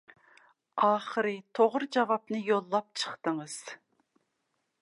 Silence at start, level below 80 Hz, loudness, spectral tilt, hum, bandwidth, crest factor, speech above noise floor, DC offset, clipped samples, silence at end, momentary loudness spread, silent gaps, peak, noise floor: 0.75 s; -88 dBFS; -30 LUFS; -4 dB/octave; none; 11.5 kHz; 20 dB; 50 dB; under 0.1%; under 0.1%; 1.05 s; 14 LU; none; -12 dBFS; -80 dBFS